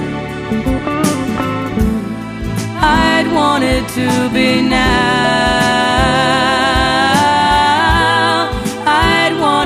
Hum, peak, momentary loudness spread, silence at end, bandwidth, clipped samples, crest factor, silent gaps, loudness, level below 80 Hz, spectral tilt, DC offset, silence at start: none; 0 dBFS; 7 LU; 0 s; 15.5 kHz; under 0.1%; 12 dB; none; -13 LUFS; -26 dBFS; -4.5 dB/octave; under 0.1%; 0 s